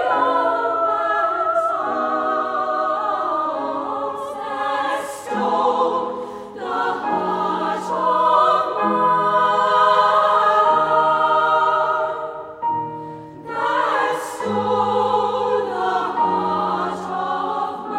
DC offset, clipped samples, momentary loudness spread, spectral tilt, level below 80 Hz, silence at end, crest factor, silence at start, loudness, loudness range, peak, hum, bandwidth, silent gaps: under 0.1%; under 0.1%; 11 LU; -4.5 dB/octave; -64 dBFS; 0 s; 16 dB; 0 s; -19 LUFS; 6 LU; -4 dBFS; none; 15 kHz; none